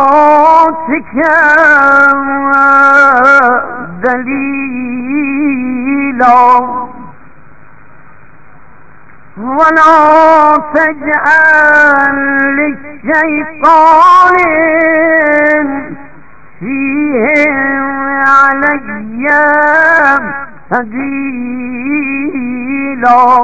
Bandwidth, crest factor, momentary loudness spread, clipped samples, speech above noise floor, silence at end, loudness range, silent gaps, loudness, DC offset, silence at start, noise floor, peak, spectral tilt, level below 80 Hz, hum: 8 kHz; 8 dB; 13 LU; 2%; 32 dB; 0 s; 6 LU; none; -8 LUFS; 3%; 0 s; -40 dBFS; 0 dBFS; -5.5 dB/octave; -46 dBFS; none